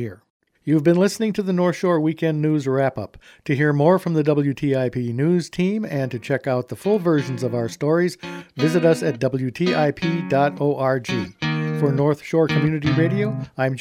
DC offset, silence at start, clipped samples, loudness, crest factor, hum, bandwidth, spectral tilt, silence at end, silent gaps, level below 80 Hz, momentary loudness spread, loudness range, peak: under 0.1%; 0 s; under 0.1%; -21 LUFS; 16 dB; none; 15.5 kHz; -7 dB/octave; 0 s; 0.30-0.40 s; -56 dBFS; 7 LU; 2 LU; -4 dBFS